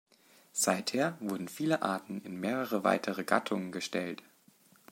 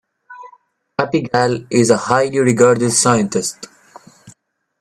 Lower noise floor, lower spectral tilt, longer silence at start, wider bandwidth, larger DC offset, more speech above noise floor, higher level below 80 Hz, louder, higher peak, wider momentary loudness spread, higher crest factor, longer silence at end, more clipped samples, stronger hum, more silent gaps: first, -64 dBFS vs -54 dBFS; about the same, -4 dB/octave vs -4.5 dB/octave; first, 0.55 s vs 0.3 s; first, 16.5 kHz vs 14 kHz; neither; second, 31 dB vs 40 dB; second, -82 dBFS vs -56 dBFS; second, -33 LUFS vs -15 LUFS; second, -10 dBFS vs 0 dBFS; second, 8 LU vs 12 LU; first, 24 dB vs 18 dB; first, 0.75 s vs 0.5 s; neither; neither; neither